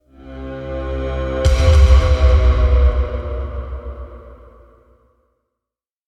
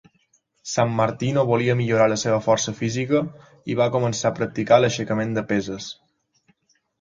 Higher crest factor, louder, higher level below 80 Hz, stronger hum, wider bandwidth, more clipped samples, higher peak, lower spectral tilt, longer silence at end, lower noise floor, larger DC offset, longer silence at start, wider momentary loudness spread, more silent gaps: about the same, 16 dB vs 20 dB; first, -16 LUFS vs -21 LUFS; first, -18 dBFS vs -58 dBFS; neither; second, 8 kHz vs 9.2 kHz; neither; about the same, 0 dBFS vs -2 dBFS; about the same, -6.5 dB/octave vs -5.5 dB/octave; first, 1.75 s vs 1.1 s; first, -86 dBFS vs -65 dBFS; neither; second, 0.25 s vs 0.65 s; first, 21 LU vs 14 LU; neither